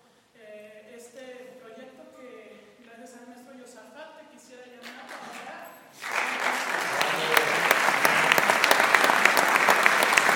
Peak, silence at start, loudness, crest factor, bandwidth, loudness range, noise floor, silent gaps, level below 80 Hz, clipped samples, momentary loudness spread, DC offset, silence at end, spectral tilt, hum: 0 dBFS; 0.45 s; -21 LUFS; 26 dB; 17.5 kHz; 24 LU; -54 dBFS; none; -80 dBFS; under 0.1%; 24 LU; under 0.1%; 0 s; -1 dB/octave; none